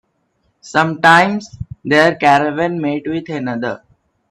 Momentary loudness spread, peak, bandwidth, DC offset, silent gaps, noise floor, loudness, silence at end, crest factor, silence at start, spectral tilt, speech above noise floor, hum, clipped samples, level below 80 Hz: 15 LU; 0 dBFS; 13.5 kHz; under 0.1%; none; -64 dBFS; -14 LUFS; 0.55 s; 16 dB; 0.65 s; -5.5 dB/octave; 49 dB; none; under 0.1%; -50 dBFS